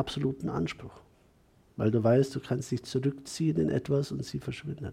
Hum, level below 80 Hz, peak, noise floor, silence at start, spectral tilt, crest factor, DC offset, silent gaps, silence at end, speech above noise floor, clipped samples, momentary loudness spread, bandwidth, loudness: none; -58 dBFS; -14 dBFS; -63 dBFS; 0 s; -7 dB/octave; 18 dB; under 0.1%; none; 0 s; 33 dB; under 0.1%; 13 LU; 14.5 kHz; -30 LUFS